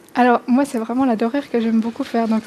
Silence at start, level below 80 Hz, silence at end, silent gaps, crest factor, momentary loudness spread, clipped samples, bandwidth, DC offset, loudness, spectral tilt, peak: 0.15 s; -62 dBFS; 0 s; none; 16 dB; 5 LU; under 0.1%; 13 kHz; under 0.1%; -19 LUFS; -6 dB/octave; -2 dBFS